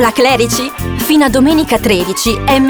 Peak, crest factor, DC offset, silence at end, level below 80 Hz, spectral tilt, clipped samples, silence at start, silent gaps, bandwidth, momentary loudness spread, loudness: 0 dBFS; 10 dB; under 0.1%; 0 s; -30 dBFS; -4 dB/octave; under 0.1%; 0 s; none; over 20 kHz; 6 LU; -11 LUFS